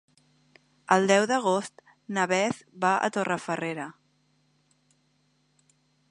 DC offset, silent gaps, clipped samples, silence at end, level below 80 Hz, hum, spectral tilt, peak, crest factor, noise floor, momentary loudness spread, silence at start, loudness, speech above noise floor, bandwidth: under 0.1%; none; under 0.1%; 2.2 s; -76 dBFS; none; -4 dB/octave; -6 dBFS; 24 dB; -69 dBFS; 15 LU; 0.9 s; -26 LUFS; 43 dB; 11 kHz